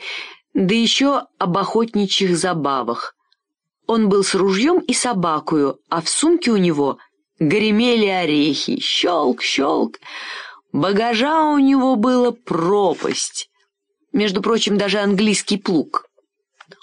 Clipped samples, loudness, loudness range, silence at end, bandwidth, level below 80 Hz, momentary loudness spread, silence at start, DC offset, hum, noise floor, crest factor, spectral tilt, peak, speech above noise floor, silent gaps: under 0.1%; -18 LUFS; 2 LU; 0.8 s; 10.5 kHz; -62 dBFS; 10 LU; 0 s; under 0.1%; none; -78 dBFS; 14 dB; -4 dB/octave; -6 dBFS; 60 dB; none